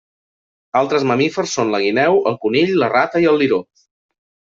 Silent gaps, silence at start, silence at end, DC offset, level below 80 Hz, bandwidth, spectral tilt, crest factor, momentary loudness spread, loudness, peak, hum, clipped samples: none; 0.75 s; 0.95 s; under 0.1%; -60 dBFS; 7.8 kHz; -5 dB/octave; 14 dB; 5 LU; -16 LUFS; -2 dBFS; none; under 0.1%